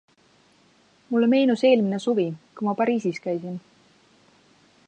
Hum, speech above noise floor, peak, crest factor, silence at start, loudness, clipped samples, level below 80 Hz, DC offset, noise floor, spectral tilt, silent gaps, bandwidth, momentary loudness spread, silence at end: none; 38 dB; -6 dBFS; 18 dB; 1.1 s; -23 LUFS; under 0.1%; -76 dBFS; under 0.1%; -60 dBFS; -6.5 dB/octave; none; 9 kHz; 11 LU; 1.3 s